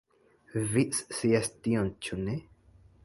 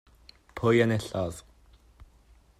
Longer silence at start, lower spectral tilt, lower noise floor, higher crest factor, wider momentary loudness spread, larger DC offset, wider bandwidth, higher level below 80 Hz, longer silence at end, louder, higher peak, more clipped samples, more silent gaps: about the same, 0.55 s vs 0.55 s; second, -5 dB/octave vs -6.5 dB/octave; about the same, -61 dBFS vs -59 dBFS; about the same, 18 dB vs 20 dB; second, 8 LU vs 21 LU; neither; second, 12 kHz vs 14 kHz; about the same, -56 dBFS vs -56 dBFS; about the same, 0.65 s vs 0.55 s; second, -30 LUFS vs -27 LUFS; about the same, -12 dBFS vs -10 dBFS; neither; neither